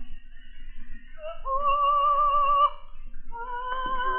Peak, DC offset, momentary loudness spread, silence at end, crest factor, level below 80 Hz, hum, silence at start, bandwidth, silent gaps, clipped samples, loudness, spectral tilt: -12 dBFS; under 0.1%; 19 LU; 0 s; 14 dB; -38 dBFS; none; 0 s; 3.4 kHz; none; under 0.1%; -24 LUFS; -0.5 dB/octave